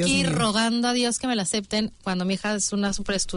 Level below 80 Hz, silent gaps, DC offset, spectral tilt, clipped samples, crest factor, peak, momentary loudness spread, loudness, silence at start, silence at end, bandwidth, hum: -46 dBFS; none; under 0.1%; -3.5 dB/octave; under 0.1%; 14 dB; -10 dBFS; 5 LU; -24 LUFS; 0 s; 0 s; 11 kHz; none